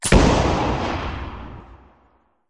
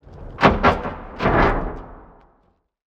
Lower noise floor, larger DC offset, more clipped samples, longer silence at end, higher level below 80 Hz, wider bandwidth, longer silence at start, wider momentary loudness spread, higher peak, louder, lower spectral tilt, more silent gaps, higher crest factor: about the same, -60 dBFS vs -63 dBFS; neither; neither; second, 0.75 s vs 0.9 s; about the same, -28 dBFS vs -30 dBFS; first, 11.5 kHz vs 8.2 kHz; about the same, 0 s vs 0.1 s; first, 23 LU vs 18 LU; about the same, -2 dBFS vs 0 dBFS; about the same, -20 LUFS vs -19 LUFS; second, -5 dB/octave vs -7 dB/octave; neither; about the same, 20 dB vs 22 dB